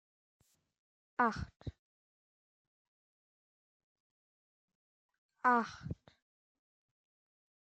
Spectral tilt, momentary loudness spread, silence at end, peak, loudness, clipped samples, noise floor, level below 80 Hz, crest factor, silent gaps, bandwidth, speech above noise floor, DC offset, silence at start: -6.5 dB/octave; 19 LU; 1.75 s; -16 dBFS; -35 LUFS; under 0.1%; under -90 dBFS; -64 dBFS; 26 dB; 1.79-4.68 s, 4.75-5.09 s, 5.18-5.29 s; 8.8 kHz; over 55 dB; under 0.1%; 1.2 s